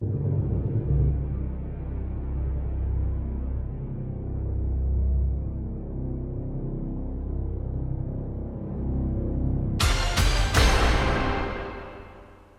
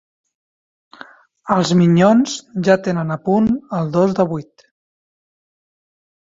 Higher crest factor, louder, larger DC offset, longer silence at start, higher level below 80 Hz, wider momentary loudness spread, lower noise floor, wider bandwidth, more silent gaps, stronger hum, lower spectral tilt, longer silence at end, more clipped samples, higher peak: about the same, 20 dB vs 16 dB; second, -28 LUFS vs -16 LUFS; neither; second, 0 s vs 1.45 s; first, -28 dBFS vs -54 dBFS; about the same, 11 LU vs 9 LU; first, -48 dBFS vs -42 dBFS; first, 15.5 kHz vs 7.8 kHz; neither; neither; about the same, -5.5 dB/octave vs -6.5 dB/octave; second, 0.15 s vs 1.8 s; neither; second, -6 dBFS vs -2 dBFS